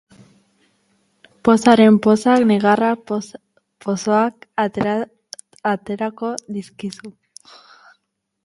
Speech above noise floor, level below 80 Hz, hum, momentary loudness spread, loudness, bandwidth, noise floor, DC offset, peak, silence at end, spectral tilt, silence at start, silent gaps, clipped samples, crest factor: 54 dB; -60 dBFS; none; 19 LU; -17 LUFS; 11.5 kHz; -71 dBFS; under 0.1%; 0 dBFS; 1.35 s; -6 dB/octave; 1.45 s; none; under 0.1%; 18 dB